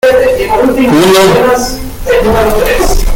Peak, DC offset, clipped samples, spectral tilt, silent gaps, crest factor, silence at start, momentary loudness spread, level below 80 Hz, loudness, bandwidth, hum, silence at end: 0 dBFS; under 0.1%; under 0.1%; -4.5 dB/octave; none; 8 dB; 0.05 s; 7 LU; -16 dBFS; -8 LUFS; 17.5 kHz; none; 0 s